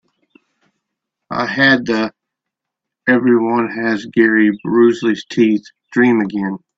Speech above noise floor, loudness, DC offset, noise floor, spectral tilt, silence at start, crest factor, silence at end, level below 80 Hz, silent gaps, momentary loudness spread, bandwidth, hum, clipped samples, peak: 67 dB; -15 LUFS; under 0.1%; -81 dBFS; -6 dB/octave; 1.3 s; 16 dB; 0.2 s; -60 dBFS; none; 10 LU; 7.6 kHz; none; under 0.1%; 0 dBFS